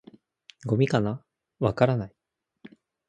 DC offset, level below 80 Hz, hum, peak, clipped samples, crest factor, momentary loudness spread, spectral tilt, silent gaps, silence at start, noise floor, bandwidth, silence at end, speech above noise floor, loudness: under 0.1%; -56 dBFS; none; -4 dBFS; under 0.1%; 24 dB; 16 LU; -8 dB/octave; none; 0.65 s; -63 dBFS; 9 kHz; 0.4 s; 39 dB; -26 LUFS